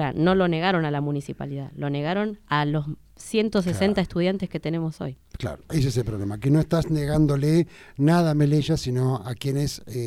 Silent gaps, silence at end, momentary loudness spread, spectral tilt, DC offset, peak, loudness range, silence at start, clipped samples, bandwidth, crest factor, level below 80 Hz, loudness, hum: none; 0 s; 12 LU; -7 dB/octave; under 0.1%; -8 dBFS; 4 LU; 0 s; under 0.1%; 14 kHz; 16 dB; -44 dBFS; -24 LUFS; none